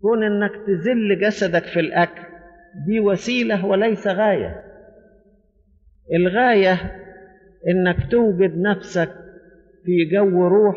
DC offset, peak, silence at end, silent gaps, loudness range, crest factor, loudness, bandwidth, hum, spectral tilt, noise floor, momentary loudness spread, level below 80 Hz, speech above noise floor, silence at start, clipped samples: under 0.1%; -4 dBFS; 0 s; none; 3 LU; 14 dB; -19 LUFS; 7.6 kHz; none; -5 dB/octave; -57 dBFS; 11 LU; -46 dBFS; 39 dB; 0.05 s; under 0.1%